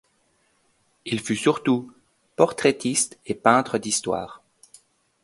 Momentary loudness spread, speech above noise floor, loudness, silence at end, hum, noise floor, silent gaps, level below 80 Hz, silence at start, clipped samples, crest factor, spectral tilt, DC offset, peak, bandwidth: 11 LU; 44 dB; -23 LUFS; 0.9 s; none; -66 dBFS; none; -62 dBFS; 1.05 s; under 0.1%; 24 dB; -3.5 dB/octave; under 0.1%; 0 dBFS; 12 kHz